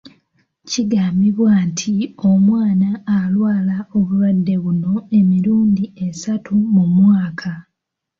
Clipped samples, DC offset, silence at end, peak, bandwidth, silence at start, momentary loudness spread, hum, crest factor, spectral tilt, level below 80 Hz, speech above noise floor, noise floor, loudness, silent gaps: under 0.1%; under 0.1%; 0.6 s; -4 dBFS; 7.6 kHz; 0.05 s; 10 LU; none; 12 dB; -7 dB/octave; -54 dBFS; 63 dB; -78 dBFS; -16 LUFS; none